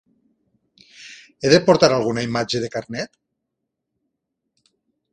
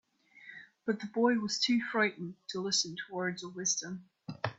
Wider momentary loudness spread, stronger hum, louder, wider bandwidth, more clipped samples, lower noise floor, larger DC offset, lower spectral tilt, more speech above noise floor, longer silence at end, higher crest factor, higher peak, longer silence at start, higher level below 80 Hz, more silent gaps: first, 24 LU vs 16 LU; neither; first, -19 LUFS vs -32 LUFS; first, 10 kHz vs 8 kHz; neither; first, -79 dBFS vs -56 dBFS; neither; first, -4.5 dB/octave vs -3 dB/octave; first, 61 dB vs 23 dB; first, 2.05 s vs 0.05 s; about the same, 22 dB vs 22 dB; first, 0 dBFS vs -14 dBFS; first, 1 s vs 0.4 s; first, -56 dBFS vs -78 dBFS; neither